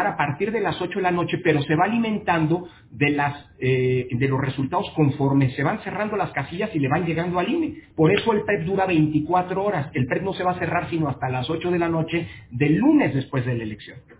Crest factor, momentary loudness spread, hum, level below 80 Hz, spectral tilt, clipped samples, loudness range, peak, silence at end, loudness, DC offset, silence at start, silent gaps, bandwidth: 18 dB; 7 LU; none; -50 dBFS; -11 dB/octave; under 0.1%; 1 LU; -6 dBFS; 0.05 s; -23 LUFS; under 0.1%; 0 s; none; 4 kHz